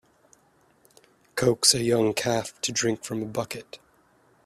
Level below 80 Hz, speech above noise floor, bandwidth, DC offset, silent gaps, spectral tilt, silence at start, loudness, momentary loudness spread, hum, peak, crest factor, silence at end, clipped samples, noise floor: -60 dBFS; 37 dB; 15 kHz; under 0.1%; none; -3 dB/octave; 1.35 s; -24 LUFS; 16 LU; none; -4 dBFS; 24 dB; 0.7 s; under 0.1%; -63 dBFS